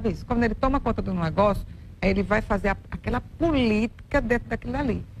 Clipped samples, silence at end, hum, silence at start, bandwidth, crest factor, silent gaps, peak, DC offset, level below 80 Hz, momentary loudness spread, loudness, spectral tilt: under 0.1%; 0 s; none; 0 s; 13 kHz; 16 dB; none; -10 dBFS; under 0.1%; -34 dBFS; 7 LU; -25 LUFS; -7.5 dB/octave